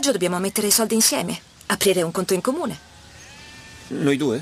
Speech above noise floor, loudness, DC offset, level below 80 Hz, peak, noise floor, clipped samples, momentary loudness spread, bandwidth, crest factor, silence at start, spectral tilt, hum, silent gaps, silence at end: 23 dB; -20 LUFS; under 0.1%; -56 dBFS; -4 dBFS; -44 dBFS; under 0.1%; 23 LU; 15.5 kHz; 18 dB; 0 s; -3 dB/octave; none; none; 0 s